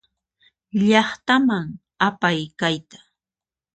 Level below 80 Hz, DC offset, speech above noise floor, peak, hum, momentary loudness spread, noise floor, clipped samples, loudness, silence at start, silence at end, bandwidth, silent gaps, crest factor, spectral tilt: -62 dBFS; under 0.1%; over 70 dB; -2 dBFS; none; 10 LU; under -90 dBFS; under 0.1%; -20 LUFS; 0.75 s; 0.8 s; 9 kHz; none; 20 dB; -5.5 dB/octave